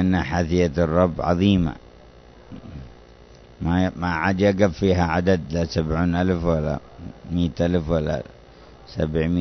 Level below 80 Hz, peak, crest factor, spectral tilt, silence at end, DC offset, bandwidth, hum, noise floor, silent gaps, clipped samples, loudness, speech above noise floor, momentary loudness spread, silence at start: -38 dBFS; -4 dBFS; 18 dB; -7.5 dB/octave; 0 s; under 0.1%; 6.4 kHz; none; -47 dBFS; none; under 0.1%; -22 LUFS; 26 dB; 20 LU; 0 s